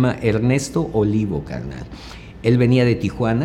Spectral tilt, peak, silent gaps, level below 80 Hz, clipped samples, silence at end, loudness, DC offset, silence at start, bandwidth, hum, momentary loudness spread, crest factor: -7 dB/octave; -4 dBFS; none; -40 dBFS; under 0.1%; 0 s; -19 LUFS; under 0.1%; 0 s; 12 kHz; none; 18 LU; 16 dB